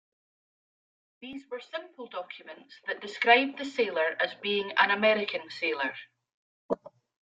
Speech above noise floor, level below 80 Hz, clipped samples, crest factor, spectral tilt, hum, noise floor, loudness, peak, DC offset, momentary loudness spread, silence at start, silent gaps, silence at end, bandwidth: over 61 dB; -80 dBFS; under 0.1%; 26 dB; -4 dB/octave; none; under -90 dBFS; -28 LUFS; -6 dBFS; under 0.1%; 21 LU; 1.2 s; 6.34-6.69 s; 0.35 s; 7.8 kHz